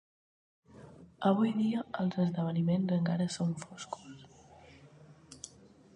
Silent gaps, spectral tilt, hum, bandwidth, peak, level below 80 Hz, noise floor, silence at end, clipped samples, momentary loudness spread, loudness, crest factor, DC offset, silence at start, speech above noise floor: none; -7 dB/octave; none; 10.5 kHz; -14 dBFS; -70 dBFS; -58 dBFS; 0.5 s; under 0.1%; 21 LU; -32 LUFS; 20 dB; under 0.1%; 0.75 s; 27 dB